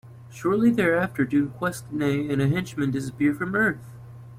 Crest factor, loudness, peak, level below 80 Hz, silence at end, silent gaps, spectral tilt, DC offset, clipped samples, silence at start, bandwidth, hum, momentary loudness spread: 14 dB; -24 LUFS; -10 dBFS; -56 dBFS; 0 s; none; -7 dB/octave; under 0.1%; under 0.1%; 0.05 s; 16 kHz; none; 10 LU